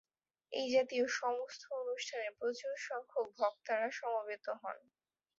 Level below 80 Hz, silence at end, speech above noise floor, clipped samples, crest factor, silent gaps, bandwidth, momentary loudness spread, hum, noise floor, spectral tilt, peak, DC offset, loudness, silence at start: -88 dBFS; 0.6 s; 20 dB; under 0.1%; 18 dB; none; 7.6 kHz; 10 LU; none; -58 dBFS; 0.5 dB/octave; -20 dBFS; under 0.1%; -39 LUFS; 0.5 s